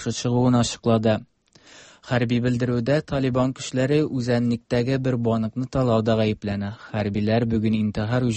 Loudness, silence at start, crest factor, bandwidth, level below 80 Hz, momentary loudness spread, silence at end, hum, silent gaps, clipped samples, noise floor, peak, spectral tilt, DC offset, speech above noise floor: -23 LUFS; 0 s; 14 dB; 8.8 kHz; -48 dBFS; 6 LU; 0 s; none; none; under 0.1%; -51 dBFS; -8 dBFS; -6.5 dB/octave; under 0.1%; 29 dB